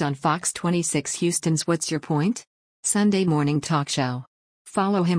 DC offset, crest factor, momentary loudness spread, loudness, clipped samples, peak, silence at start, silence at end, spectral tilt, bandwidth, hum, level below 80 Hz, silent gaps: under 0.1%; 14 dB; 7 LU; -23 LUFS; under 0.1%; -10 dBFS; 0 s; 0 s; -4.5 dB/octave; 10.5 kHz; none; -62 dBFS; 2.47-2.83 s, 4.27-4.65 s